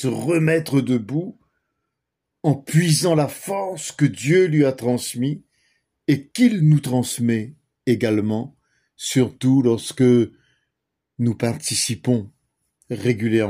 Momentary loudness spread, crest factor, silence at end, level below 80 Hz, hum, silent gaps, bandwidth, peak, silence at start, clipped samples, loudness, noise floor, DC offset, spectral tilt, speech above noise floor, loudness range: 11 LU; 16 dB; 0 s; -62 dBFS; none; none; 16 kHz; -4 dBFS; 0 s; under 0.1%; -20 LUFS; -80 dBFS; under 0.1%; -5.5 dB/octave; 61 dB; 3 LU